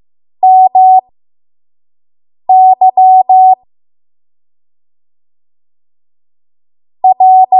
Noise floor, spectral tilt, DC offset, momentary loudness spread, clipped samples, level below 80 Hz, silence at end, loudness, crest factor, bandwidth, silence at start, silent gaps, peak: under -90 dBFS; -9 dB/octave; under 0.1%; 7 LU; under 0.1%; -72 dBFS; 0 s; -7 LUFS; 10 dB; 1.1 kHz; 0.4 s; none; 0 dBFS